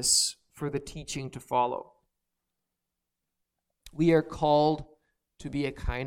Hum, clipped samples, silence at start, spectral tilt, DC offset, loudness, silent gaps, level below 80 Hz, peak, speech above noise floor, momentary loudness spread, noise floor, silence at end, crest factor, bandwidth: none; under 0.1%; 0 s; -3.5 dB/octave; under 0.1%; -28 LUFS; none; -46 dBFS; -10 dBFS; 58 dB; 14 LU; -85 dBFS; 0 s; 20 dB; 18 kHz